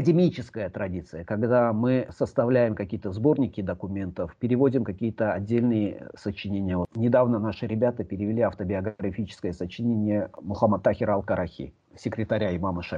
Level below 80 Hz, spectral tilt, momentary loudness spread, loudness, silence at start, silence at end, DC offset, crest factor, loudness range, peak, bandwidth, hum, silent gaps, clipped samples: -54 dBFS; -9 dB/octave; 11 LU; -26 LUFS; 0 s; 0 s; under 0.1%; 16 dB; 2 LU; -10 dBFS; 7.8 kHz; none; none; under 0.1%